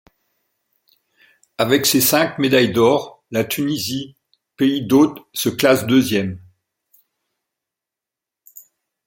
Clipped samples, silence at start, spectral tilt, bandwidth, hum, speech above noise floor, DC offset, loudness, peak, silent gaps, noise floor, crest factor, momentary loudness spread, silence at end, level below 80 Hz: under 0.1%; 1.6 s; -4 dB/octave; 17 kHz; none; 69 dB; under 0.1%; -17 LUFS; 0 dBFS; none; -86 dBFS; 20 dB; 11 LU; 2.7 s; -60 dBFS